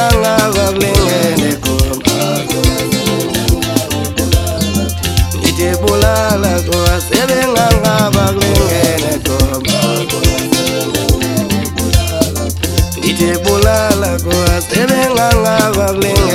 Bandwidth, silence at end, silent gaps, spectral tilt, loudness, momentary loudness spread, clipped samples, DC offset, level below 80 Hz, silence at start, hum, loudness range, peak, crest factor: 18 kHz; 0 s; none; -4.5 dB/octave; -12 LUFS; 4 LU; 0.3%; under 0.1%; -22 dBFS; 0 s; none; 2 LU; 0 dBFS; 12 dB